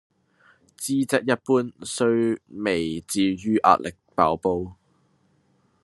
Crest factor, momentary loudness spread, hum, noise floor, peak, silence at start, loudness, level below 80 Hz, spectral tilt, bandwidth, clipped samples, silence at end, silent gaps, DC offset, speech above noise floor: 22 dB; 10 LU; none; -65 dBFS; -2 dBFS; 0.8 s; -23 LUFS; -64 dBFS; -5 dB/octave; 13 kHz; under 0.1%; 1.1 s; none; under 0.1%; 42 dB